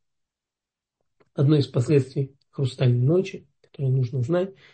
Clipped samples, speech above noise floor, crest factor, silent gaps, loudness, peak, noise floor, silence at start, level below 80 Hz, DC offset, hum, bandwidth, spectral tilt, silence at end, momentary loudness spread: under 0.1%; 66 dB; 18 dB; none; -24 LUFS; -6 dBFS; -89 dBFS; 1.4 s; -64 dBFS; under 0.1%; none; 8.6 kHz; -8.5 dB/octave; 0.2 s; 12 LU